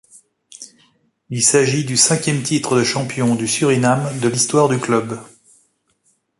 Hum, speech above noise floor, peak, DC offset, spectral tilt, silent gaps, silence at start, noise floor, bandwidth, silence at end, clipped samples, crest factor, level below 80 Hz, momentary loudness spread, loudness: none; 47 dB; 0 dBFS; under 0.1%; -4 dB/octave; none; 0.5 s; -63 dBFS; 11.5 kHz; 1.15 s; under 0.1%; 18 dB; -58 dBFS; 15 LU; -16 LUFS